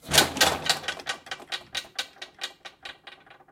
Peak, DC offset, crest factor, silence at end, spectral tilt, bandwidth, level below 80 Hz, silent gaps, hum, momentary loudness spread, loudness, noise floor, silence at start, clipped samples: -2 dBFS; under 0.1%; 28 dB; 0.2 s; -1 dB/octave; 16.5 kHz; -56 dBFS; none; none; 21 LU; -26 LUFS; -50 dBFS; 0.05 s; under 0.1%